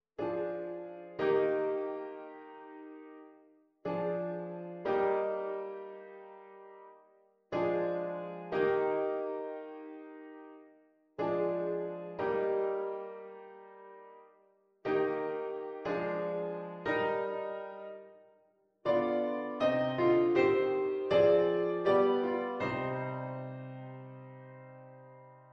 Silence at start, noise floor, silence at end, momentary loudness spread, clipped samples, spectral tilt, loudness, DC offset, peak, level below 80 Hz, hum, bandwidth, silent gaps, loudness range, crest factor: 0.2 s; -70 dBFS; 0.1 s; 23 LU; under 0.1%; -8 dB/octave; -33 LUFS; under 0.1%; -16 dBFS; -72 dBFS; none; 6.2 kHz; none; 9 LU; 20 dB